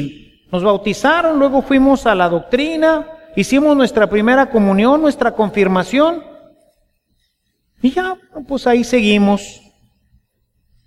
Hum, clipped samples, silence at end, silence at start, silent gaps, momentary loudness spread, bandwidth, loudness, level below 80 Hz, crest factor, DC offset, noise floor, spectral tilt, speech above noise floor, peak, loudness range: none; under 0.1%; 1.35 s; 0 s; none; 9 LU; 13.5 kHz; -14 LUFS; -42 dBFS; 14 dB; under 0.1%; -67 dBFS; -5.5 dB/octave; 53 dB; 0 dBFS; 5 LU